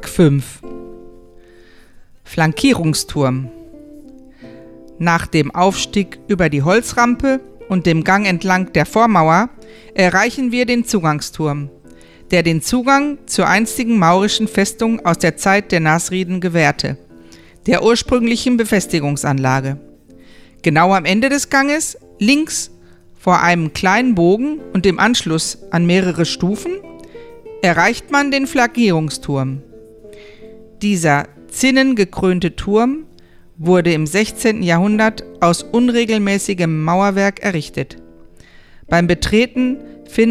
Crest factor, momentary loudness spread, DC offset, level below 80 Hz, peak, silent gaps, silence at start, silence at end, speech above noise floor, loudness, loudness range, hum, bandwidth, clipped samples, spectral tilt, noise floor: 16 dB; 9 LU; under 0.1%; -42 dBFS; 0 dBFS; none; 0 s; 0 s; 28 dB; -15 LUFS; 4 LU; none; 15 kHz; under 0.1%; -5 dB/octave; -43 dBFS